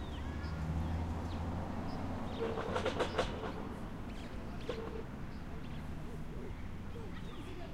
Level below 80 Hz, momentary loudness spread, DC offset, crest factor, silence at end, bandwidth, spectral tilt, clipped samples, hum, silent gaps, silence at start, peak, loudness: -46 dBFS; 10 LU; under 0.1%; 20 dB; 0 s; 15.5 kHz; -6.5 dB/octave; under 0.1%; none; none; 0 s; -20 dBFS; -41 LUFS